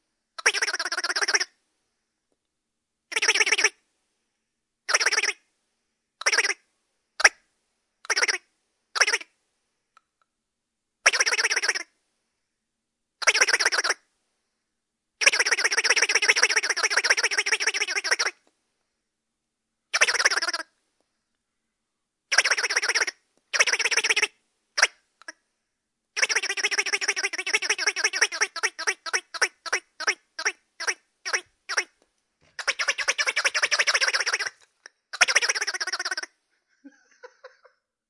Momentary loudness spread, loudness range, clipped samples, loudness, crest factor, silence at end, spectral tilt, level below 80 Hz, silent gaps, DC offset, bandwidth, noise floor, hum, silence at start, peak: 10 LU; 5 LU; under 0.1%; -23 LUFS; 28 dB; 0.6 s; 3.5 dB/octave; -74 dBFS; none; under 0.1%; 11.5 kHz; -82 dBFS; none; 0.4 s; 0 dBFS